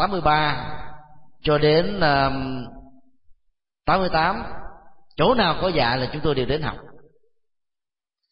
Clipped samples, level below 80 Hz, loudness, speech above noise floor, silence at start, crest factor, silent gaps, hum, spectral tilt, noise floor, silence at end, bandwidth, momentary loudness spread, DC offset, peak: under 0.1%; -40 dBFS; -21 LUFS; 68 dB; 0 s; 18 dB; none; none; -10.5 dB/octave; -88 dBFS; 1.3 s; 5.4 kHz; 19 LU; under 0.1%; -6 dBFS